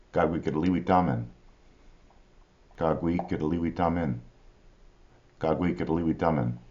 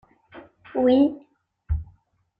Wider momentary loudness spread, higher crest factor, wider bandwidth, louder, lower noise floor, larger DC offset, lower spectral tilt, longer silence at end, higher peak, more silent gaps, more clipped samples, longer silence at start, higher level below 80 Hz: second, 8 LU vs 14 LU; about the same, 20 dB vs 18 dB; first, 7.4 kHz vs 5 kHz; second, -28 LUFS vs -23 LUFS; about the same, -57 dBFS vs -60 dBFS; neither; second, -7.5 dB/octave vs -10 dB/octave; second, 0.1 s vs 0.55 s; about the same, -10 dBFS vs -8 dBFS; neither; neither; second, 0.15 s vs 0.35 s; second, -50 dBFS vs -40 dBFS